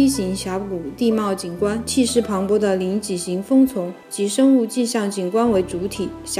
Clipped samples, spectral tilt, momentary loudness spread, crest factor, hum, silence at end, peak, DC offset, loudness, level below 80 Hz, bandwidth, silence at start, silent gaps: under 0.1%; -5 dB/octave; 9 LU; 14 dB; none; 0 s; -6 dBFS; under 0.1%; -20 LUFS; -48 dBFS; 16 kHz; 0 s; none